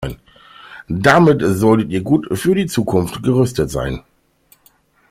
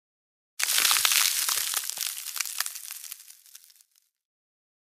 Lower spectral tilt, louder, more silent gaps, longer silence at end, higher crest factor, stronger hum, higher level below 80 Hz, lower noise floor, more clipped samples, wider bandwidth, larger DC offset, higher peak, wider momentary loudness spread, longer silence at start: first, -6.5 dB/octave vs 4.5 dB/octave; first, -16 LUFS vs -24 LUFS; neither; second, 1.1 s vs 1.35 s; second, 16 dB vs 28 dB; neither; first, -40 dBFS vs -80 dBFS; second, -55 dBFS vs -65 dBFS; neither; about the same, 16 kHz vs 16.5 kHz; neither; about the same, 0 dBFS vs -2 dBFS; about the same, 16 LU vs 18 LU; second, 0 s vs 0.6 s